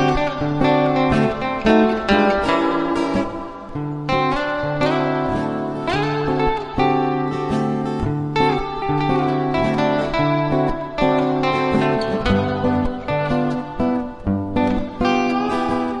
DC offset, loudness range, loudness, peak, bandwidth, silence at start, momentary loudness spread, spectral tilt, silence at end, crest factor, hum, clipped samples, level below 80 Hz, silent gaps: under 0.1%; 3 LU; -19 LUFS; 0 dBFS; 11 kHz; 0 s; 6 LU; -7 dB/octave; 0 s; 18 dB; none; under 0.1%; -36 dBFS; none